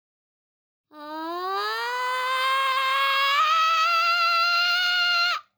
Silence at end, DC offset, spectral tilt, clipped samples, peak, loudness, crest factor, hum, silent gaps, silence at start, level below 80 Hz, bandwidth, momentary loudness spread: 0.15 s; under 0.1%; 1.5 dB/octave; under 0.1%; -10 dBFS; -21 LUFS; 14 dB; none; none; 0.95 s; -90 dBFS; over 20 kHz; 9 LU